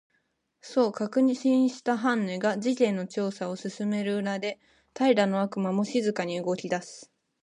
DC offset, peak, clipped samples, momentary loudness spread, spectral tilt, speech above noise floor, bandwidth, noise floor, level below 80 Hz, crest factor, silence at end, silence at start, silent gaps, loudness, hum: under 0.1%; -10 dBFS; under 0.1%; 9 LU; -6 dB/octave; 48 dB; 10.5 kHz; -74 dBFS; -76 dBFS; 18 dB; 0.4 s; 0.65 s; none; -27 LUFS; none